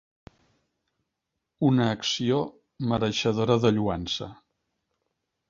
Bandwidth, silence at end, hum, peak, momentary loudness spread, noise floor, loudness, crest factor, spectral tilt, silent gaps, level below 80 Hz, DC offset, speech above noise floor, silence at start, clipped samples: 7.6 kHz; 1.15 s; none; -6 dBFS; 10 LU; -83 dBFS; -25 LUFS; 22 dB; -5.5 dB/octave; none; -54 dBFS; under 0.1%; 58 dB; 1.6 s; under 0.1%